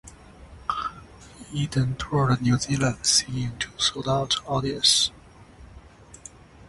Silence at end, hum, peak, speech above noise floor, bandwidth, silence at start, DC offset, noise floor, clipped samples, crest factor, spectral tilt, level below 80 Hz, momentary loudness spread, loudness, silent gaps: 0.05 s; none; -6 dBFS; 24 dB; 11.5 kHz; 0.05 s; under 0.1%; -48 dBFS; under 0.1%; 22 dB; -3.5 dB/octave; -48 dBFS; 15 LU; -24 LUFS; none